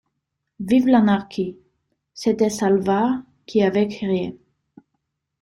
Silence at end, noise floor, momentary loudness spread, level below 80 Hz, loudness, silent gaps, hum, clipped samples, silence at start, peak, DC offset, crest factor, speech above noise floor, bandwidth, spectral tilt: 1.05 s; -78 dBFS; 12 LU; -58 dBFS; -20 LUFS; none; none; under 0.1%; 0.6 s; -4 dBFS; under 0.1%; 18 dB; 59 dB; 12 kHz; -6.5 dB/octave